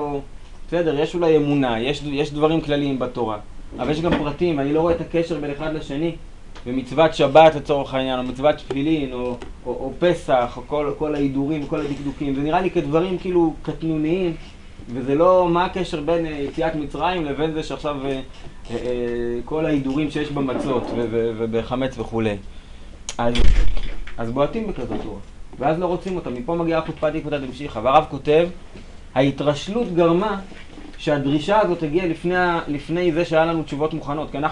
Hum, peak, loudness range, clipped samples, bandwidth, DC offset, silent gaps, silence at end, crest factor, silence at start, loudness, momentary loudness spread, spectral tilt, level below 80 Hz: none; 0 dBFS; 5 LU; under 0.1%; 10.5 kHz; under 0.1%; none; 0 s; 20 dB; 0 s; -21 LUFS; 11 LU; -6.5 dB/octave; -34 dBFS